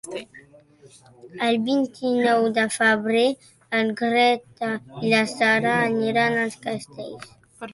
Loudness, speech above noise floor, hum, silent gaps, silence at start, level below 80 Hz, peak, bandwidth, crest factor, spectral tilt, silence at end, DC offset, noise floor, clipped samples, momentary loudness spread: -22 LUFS; 29 dB; none; none; 0.05 s; -66 dBFS; -6 dBFS; 11.5 kHz; 18 dB; -4.5 dB/octave; 0 s; under 0.1%; -51 dBFS; under 0.1%; 17 LU